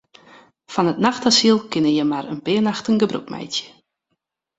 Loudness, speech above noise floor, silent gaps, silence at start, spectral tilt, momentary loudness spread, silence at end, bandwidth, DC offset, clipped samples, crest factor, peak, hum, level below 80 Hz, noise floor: -19 LUFS; 57 dB; none; 0.7 s; -4 dB/octave; 12 LU; 0.9 s; 8.2 kHz; under 0.1%; under 0.1%; 20 dB; -2 dBFS; none; -62 dBFS; -76 dBFS